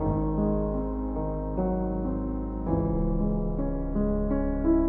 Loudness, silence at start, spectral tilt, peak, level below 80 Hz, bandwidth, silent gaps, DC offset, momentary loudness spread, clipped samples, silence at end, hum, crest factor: -29 LUFS; 0 s; -14 dB/octave; -12 dBFS; -32 dBFS; 2.4 kHz; none; under 0.1%; 4 LU; under 0.1%; 0 s; none; 14 dB